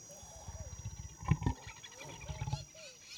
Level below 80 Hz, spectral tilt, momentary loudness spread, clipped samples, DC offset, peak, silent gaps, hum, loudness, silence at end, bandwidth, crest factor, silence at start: -50 dBFS; -5 dB/octave; 14 LU; under 0.1%; under 0.1%; -16 dBFS; none; none; -42 LUFS; 0 s; 19.5 kHz; 26 dB; 0 s